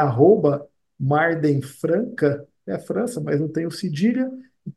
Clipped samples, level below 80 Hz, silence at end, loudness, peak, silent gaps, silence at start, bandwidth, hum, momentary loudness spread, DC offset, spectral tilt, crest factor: under 0.1%; -64 dBFS; 0.05 s; -22 LUFS; -4 dBFS; none; 0 s; 12.5 kHz; none; 13 LU; under 0.1%; -7.5 dB/octave; 18 dB